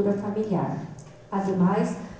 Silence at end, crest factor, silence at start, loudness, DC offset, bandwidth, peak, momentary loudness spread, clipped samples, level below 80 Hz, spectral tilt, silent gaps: 0 s; 14 dB; 0 s; -26 LUFS; under 0.1%; 8 kHz; -12 dBFS; 14 LU; under 0.1%; -58 dBFS; -8.5 dB/octave; none